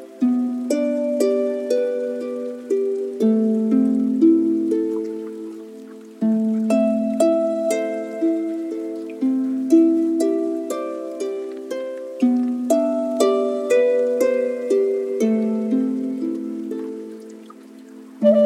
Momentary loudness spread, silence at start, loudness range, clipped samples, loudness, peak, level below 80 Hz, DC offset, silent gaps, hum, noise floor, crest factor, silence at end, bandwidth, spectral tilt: 12 LU; 0 s; 3 LU; under 0.1%; -21 LUFS; -4 dBFS; -76 dBFS; under 0.1%; none; none; -41 dBFS; 16 dB; 0 s; 15 kHz; -6.5 dB/octave